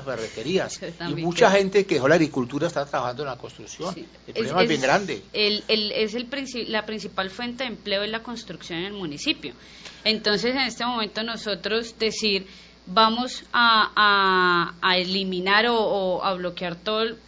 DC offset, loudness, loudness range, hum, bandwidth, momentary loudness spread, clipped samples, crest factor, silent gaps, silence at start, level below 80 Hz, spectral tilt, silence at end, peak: under 0.1%; -23 LUFS; 8 LU; none; 8 kHz; 14 LU; under 0.1%; 22 dB; none; 0 s; -56 dBFS; -4 dB/octave; 0.1 s; -2 dBFS